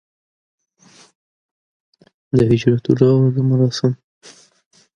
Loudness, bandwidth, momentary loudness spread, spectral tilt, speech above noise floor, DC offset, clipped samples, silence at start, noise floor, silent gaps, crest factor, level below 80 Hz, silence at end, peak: -16 LUFS; 7.4 kHz; 7 LU; -8 dB/octave; 36 dB; under 0.1%; under 0.1%; 2.35 s; -50 dBFS; none; 18 dB; -50 dBFS; 1 s; 0 dBFS